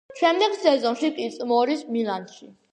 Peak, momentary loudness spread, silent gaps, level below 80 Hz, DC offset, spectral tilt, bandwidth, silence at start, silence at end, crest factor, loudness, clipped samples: -4 dBFS; 9 LU; none; -76 dBFS; under 0.1%; -4 dB/octave; 9.6 kHz; 0.1 s; 0.2 s; 18 dB; -23 LUFS; under 0.1%